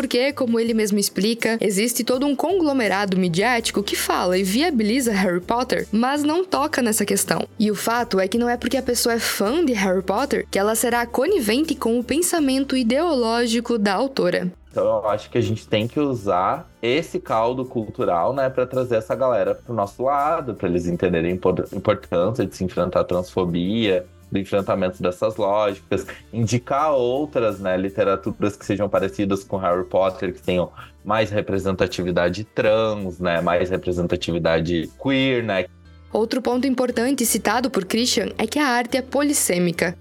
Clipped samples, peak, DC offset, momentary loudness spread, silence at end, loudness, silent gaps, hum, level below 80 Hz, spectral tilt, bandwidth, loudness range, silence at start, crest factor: under 0.1%; 0 dBFS; under 0.1%; 5 LU; 0 s; -21 LUFS; none; none; -48 dBFS; -4.5 dB/octave; 18.5 kHz; 2 LU; 0 s; 20 dB